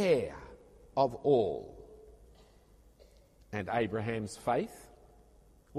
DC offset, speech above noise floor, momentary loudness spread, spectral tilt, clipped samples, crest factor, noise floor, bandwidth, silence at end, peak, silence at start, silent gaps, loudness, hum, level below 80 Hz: under 0.1%; 30 dB; 24 LU; -6.5 dB/octave; under 0.1%; 20 dB; -61 dBFS; 13.5 kHz; 0 s; -14 dBFS; 0 s; none; -33 LUFS; none; -60 dBFS